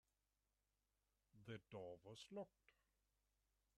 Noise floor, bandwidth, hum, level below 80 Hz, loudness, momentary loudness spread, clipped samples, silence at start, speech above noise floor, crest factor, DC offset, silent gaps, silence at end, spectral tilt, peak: under -90 dBFS; 10 kHz; none; -88 dBFS; -59 LUFS; 5 LU; under 0.1%; 1.35 s; over 32 dB; 20 dB; under 0.1%; none; 1.05 s; -5.5 dB/octave; -42 dBFS